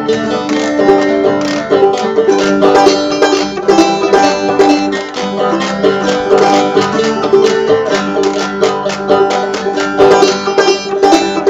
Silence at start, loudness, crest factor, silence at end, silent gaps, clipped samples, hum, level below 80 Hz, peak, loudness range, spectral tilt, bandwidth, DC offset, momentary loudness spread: 0 s; -11 LUFS; 10 dB; 0 s; none; 0.5%; none; -46 dBFS; 0 dBFS; 1 LU; -4 dB/octave; 9.2 kHz; under 0.1%; 6 LU